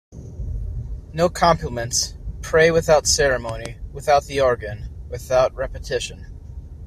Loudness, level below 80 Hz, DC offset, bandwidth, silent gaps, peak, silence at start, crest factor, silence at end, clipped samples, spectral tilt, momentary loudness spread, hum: -20 LUFS; -34 dBFS; under 0.1%; 14.5 kHz; none; -2 dBFS; 0.1 s; 20 dB; 0 s; under 0.1%; -3.5 dB/octave; 18 LU; none